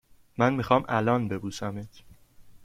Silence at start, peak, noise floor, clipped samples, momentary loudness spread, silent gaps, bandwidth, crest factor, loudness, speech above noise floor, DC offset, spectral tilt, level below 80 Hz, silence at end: 0.4 s; -6 dBFS; -51 dBFS; under 0.1%; 18 LU; none; 15.5 kHz; 22 dB; -27 LUFS; 25 dB; under 0.1%; -6.5 dB/octave; -56 dBFS; 0 s